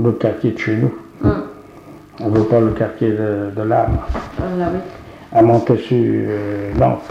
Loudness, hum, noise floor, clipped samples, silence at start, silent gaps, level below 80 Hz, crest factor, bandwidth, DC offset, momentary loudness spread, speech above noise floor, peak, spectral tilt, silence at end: -17 LUFS; none; -39 dBFS; under 0.1%; 0 s; none; -34 dBFS; 16 dB; 7.6 kHz; under 0.1%; 11 LU; 23 dB; -2 dBFS; -9 dB/octave; 0 s